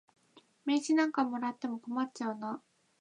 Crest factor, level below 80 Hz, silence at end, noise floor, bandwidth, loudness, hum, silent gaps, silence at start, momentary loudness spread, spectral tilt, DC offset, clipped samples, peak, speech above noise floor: 18 dB; -90 dBFS; 0.45 s; -65 dBFS; 10 kHz; -33 LUFS; none; none; 0.35 s; 12 LU; -4 dB/octave; under 0.1%; under 0.1%; -16 dBFS; 32 dB